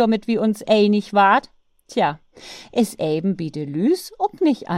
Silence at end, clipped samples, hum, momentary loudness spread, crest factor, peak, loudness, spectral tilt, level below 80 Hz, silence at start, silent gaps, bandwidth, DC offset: 0 s; under 0.1%; none; 10 LU; 16 dB; -4 dBFS; -20 LUFS; -6 dB/octave; -60 dBFS; 0 s; none; 15.5 kHz; under 0.1%